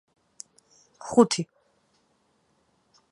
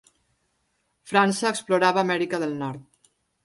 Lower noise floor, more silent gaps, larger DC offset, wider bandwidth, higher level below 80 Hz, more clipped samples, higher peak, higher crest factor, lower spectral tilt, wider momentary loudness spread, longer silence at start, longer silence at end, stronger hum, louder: about the same, -69 dBFS vs -72 dBFS; neither; neither; about the same, 11 kHz vs 11.5 kHz; about the same, -70 dBFS vs -70 dBFS; neither; about the same, -4 dBFS vs -6 dBFS; first, 26 dB vs 20 dB; about the same, -4.5 dB/octave vs -4.5 dB/octave; first, 25 LU vs 12 LU; about the same, 1.05 s vs 1.05 s; first, 1.65 s vs 0.65 s; neither; about the same, -24 LUFS vs -23 LUFS